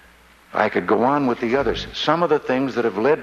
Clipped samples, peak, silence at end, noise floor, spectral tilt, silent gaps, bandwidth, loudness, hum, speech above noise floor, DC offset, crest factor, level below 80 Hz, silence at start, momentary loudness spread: under 0.1%; -2 dBFS; 0 s; -50 dBFS; -6 dB/octave; none; 11 kHz; -20 LUFS; none; 31 dB; under 0.1%; 18 dB; -46 dBFS; 0.55 s; 4 LU